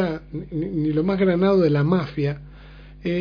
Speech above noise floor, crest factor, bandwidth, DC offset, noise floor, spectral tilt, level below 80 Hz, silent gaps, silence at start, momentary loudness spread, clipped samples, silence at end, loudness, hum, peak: 22 dB; 16 dB; 5.4 kHz; under 0.1%; -42 dBFS; -9.5 dB/octave; -44 dBFS; none; 0 s; 13 LU; under 0.1%; 0 s; -22 LUFS; none; -6 dBFS